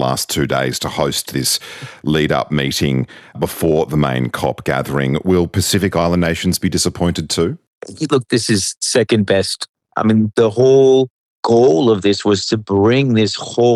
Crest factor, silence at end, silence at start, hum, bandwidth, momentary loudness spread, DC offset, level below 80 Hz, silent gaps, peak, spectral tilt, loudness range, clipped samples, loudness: 14 dB; 0 s; 0 s; none; 14.5 kHz; 9 LU; under 0.1%; -46 dBFS; 7.67-7.81 s, 8.77-8.81 s, 9.69-9.74 s, 11.10-11.43 s; -2 dBFS; -5 dB/octave; 4 LU; under 0.1%; -16 LUFS